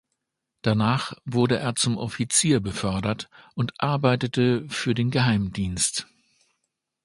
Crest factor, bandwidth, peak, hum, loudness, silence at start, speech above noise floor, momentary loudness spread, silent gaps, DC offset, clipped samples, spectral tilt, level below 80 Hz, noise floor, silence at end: 20 dB; 11.5 kHz; -4 dBFS; none; -24 LUFS; 0.65 s; 57 dB; 8 LU; none; under 0.1%; under 0.1%; -4.5 dB/octave; -50 dBFS; -81 dBFS; 1 s